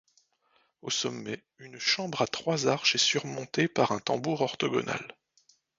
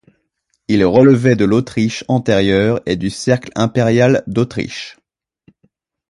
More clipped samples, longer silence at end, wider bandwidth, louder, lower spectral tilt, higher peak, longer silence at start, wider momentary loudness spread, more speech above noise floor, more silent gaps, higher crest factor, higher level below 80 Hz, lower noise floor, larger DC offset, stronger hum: neither; second, 0.65 s vs 1.2 s; second, 7.8 kHz vs 11.5 kHz; second, -28 LUFS vs -14 LUFS; second, -3 dB/octave vs -6.5 dB/octave; second, -10 dBFS vs 0 dBFS; first, 0.85 s vs 0.7 s; about the same, 14 LU vs 12 LU; second, 41 dB vs 54 dB; neither; first, 22 dB vs 16 dB; second, -70 dBFS vs -44 dBFS; about the same, -70 dBFS vs -68 dBFS; neither; neither